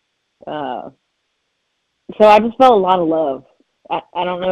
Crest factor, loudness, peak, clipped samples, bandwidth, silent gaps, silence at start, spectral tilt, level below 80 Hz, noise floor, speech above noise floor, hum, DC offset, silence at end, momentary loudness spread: 16 dB; -15 LUFS; 0 dBFS; 0.1%; 10 kHz; none; 0.45 s; -6.5 dB/octave; -54 dBFS; -70 dBFS; 56 dB; none; under 0.1%; 0 s; 19 LU